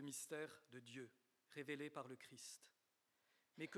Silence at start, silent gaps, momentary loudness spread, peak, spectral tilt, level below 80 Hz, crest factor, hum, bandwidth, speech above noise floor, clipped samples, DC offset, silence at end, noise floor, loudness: 0 s; none; 12 LU; -36 dBFS; -3.5 dB/octave; under -90 dBFS; 20 dB; none; 16 kHz; 31 dB; under 0.1%; under 0.1%; 0 s; -86 dBFS; -54 LUFS